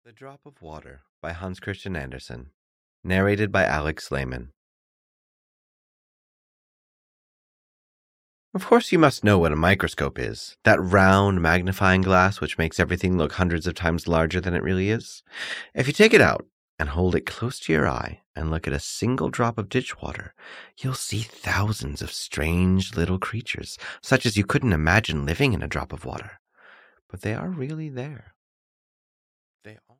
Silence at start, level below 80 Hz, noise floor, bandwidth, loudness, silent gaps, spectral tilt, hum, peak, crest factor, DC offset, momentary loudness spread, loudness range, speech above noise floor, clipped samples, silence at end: 0.2 s; -42 dBFS; -53 dBFS; 16 kHz; -23 LUFS; 1.09-1.22 s, 2.54-3.03 s, 4.57-8.52 s, 16.52-16.78 s, 18.26-18.34 s, 26.39-26.45 s, 27.01-27.09 s, 28.36-29.59 s; -5.5 dB/octave; none; -4 dBFS; 22 dB; under 0.1%; 17 LU; 11 LU; 30 dB; under 0.1%; 0.25 s